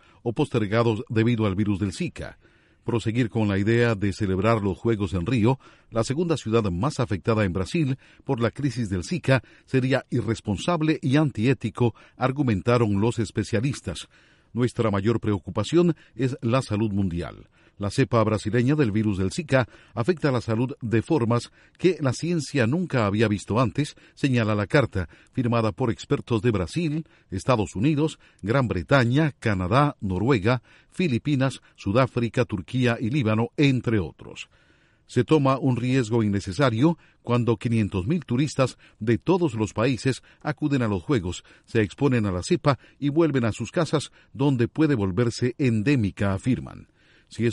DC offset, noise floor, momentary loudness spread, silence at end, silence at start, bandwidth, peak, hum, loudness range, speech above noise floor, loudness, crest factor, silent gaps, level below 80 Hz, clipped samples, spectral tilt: under 0.1%; -60 dBFS; 7 LU; 0 s; 0.25 s; 11.5 kHz; -4 dBFS; none; 2 LU; 36 dB; -24 LUFS; 20 dB; none; -50 dBFS; under 0.1%; -7 dB/octave